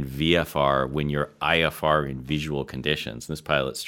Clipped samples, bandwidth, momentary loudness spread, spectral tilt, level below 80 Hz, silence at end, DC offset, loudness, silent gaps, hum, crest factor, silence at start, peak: under 0.1%; 17.5 kHz; 7 LU; -5 dB/octave; -44 dBFS; 0 s; under 0.1%; -25 LUFS; none; none; 20 dB; 0 s; -4 dBFS